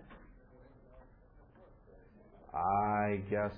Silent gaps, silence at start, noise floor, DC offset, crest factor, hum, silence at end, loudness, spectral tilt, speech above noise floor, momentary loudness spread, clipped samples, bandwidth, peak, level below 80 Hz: none; 0.05 s; -61 dBFS; under 0.1%; 18 dB; none; 0 s; -34 LUFS; -10.5 dB/octave; 28 dB; 25 LU; under 0.1%; 5.2 kHz; -20 dBFS; -60 dBFS